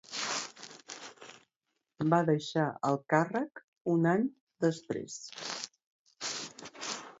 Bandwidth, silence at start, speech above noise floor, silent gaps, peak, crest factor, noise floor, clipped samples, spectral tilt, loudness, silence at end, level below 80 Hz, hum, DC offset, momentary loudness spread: 8 kHz; 0.1 s; 54 dB; 1.56-1.60 s, 3.64-3.72 s, 3.81-3.85 s, 4.41-4.47 s, 5.87-6.05 s; -12 dBFS; 20 dB; -84 dBFS; under 0.1%; -5 dB/octave; -33 LUFS; 0.1 s; -78 dBFS; none; under 0.1%; 17 LU